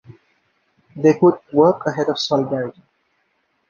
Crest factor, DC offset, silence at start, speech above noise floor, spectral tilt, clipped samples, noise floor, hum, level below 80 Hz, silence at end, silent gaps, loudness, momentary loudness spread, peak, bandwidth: 18 dB; under 0.1%; 0.95 s; 50 dB; -6.5 dB/octave; under 0.1%; -67 dBFS; none; -64 dBFS; 1 s; none; -18 LUFS; 10 LU; -2 dBFS; 7.2 kHz